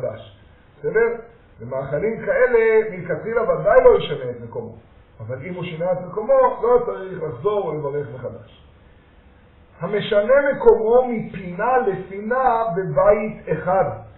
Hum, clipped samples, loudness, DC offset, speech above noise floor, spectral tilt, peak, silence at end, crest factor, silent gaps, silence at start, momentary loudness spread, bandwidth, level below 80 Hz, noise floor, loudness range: none; under 0.1%; -19 LUFS; under 0.1%; 30 dB; -4.5 dB/octave; 0 dBFS; 0.1 s; 20 dB; none; 0 s; 16 LU; 4.1 kHz; -46 dBFS; -50 dBFS; 5 LU